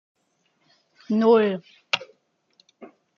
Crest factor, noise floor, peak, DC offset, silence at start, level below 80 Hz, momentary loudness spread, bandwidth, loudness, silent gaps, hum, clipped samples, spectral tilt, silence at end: 22 dB; -70 dBFS; -4 dBFS; under 0.1%; 1.1 s; -78 dBFS; 9 LU; 7 kHz; -22 LUFS; none; none; under 0.1%; -5.5 dB/octave; 0.3 s